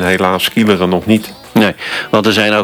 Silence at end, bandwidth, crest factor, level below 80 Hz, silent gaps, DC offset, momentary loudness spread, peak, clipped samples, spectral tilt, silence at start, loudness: 0 s; over 20 kHz; 12 dB; -48 dBFS; none; under 0.1%; 4 LU; 0 dBFS; under 0.1%; -5 dB/octave; 0 s; -13 LUFS